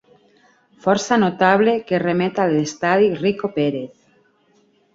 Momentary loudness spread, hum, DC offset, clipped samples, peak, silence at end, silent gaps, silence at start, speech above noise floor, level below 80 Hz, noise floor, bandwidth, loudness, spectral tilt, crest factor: 7 LU; none; under 0.1%; under 0.1%; -2 dBFS; 1.1 s; none; 0.85 s; 41 dB; -60 dBFS; -59 dBFS; 7.8 kHz; -18 LUFS; -5.5 dB/octave; 18 dB